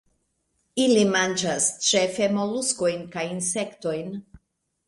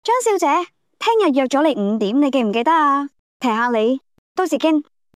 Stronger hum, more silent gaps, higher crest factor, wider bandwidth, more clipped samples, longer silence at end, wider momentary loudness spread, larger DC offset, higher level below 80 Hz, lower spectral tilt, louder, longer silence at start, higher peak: neither; second, none vs 3.19-3.40 s, 4.18-4.35 s; first, 18 dB vs 12 dB; second, 11.5 kHz vs 14.5 kHz; neither; first, 0.5 s vs 0.35 s; first, 11 LU vs 8 LU; neither; first, -64 dBFS vs -78 dBFS; second, -3 dB/octave vs -4.5 dB/octave; second, -23 LUFS vs -18 LUFS; first, 0.75 s vs 0.05 s; about the same, -8 dBFS vs -6 dBFS